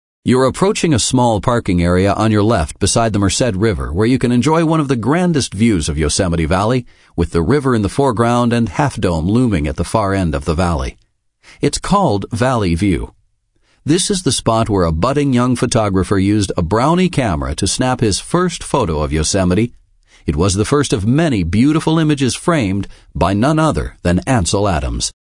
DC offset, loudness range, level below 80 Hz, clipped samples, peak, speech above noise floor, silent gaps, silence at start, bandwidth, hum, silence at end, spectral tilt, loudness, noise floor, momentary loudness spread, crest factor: under 0.1%; 3 LU; -32 dBFS; under 0.1%; 0 dBFS; 45 dB; none; 0.25 s; 11 kHz; none; 0.25 s; -5.5 dB/octave; -15 LUFS; -59 dBFS; 5 LU; 14 dB